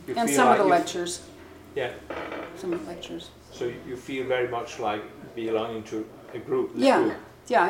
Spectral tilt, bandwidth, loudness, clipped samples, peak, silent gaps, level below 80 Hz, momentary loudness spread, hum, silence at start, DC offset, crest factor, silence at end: -4 dB/octave; 17 kHz; -26 LUFS; under 0.1%; -4 dBFS; none; -60 dBFS; 18 LU; none; 0 s; under 0.1%; 22 dB; 0 s